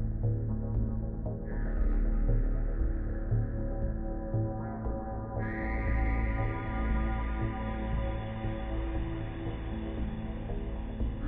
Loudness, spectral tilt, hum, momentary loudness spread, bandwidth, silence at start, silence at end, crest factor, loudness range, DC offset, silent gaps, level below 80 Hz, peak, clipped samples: -35 LUFS; -8 dB/octave; none; 6 LU; 3.8 kHz; 0 s; 0 s; 14 dB; 3 LU; under 0.1%; none; -34 dBFS; -18 dBFS; under 0.1%